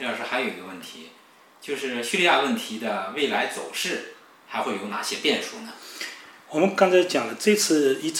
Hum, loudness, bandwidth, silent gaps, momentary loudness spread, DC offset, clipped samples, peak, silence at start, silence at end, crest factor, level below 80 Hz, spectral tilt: none; -24 LUFS; 17 kHz; none; 19 LU; under 0.1%; under 0.1%; -4 dBFS; 0 s; 0 s; 20 dB; -82 dBFS; -3 dB/octave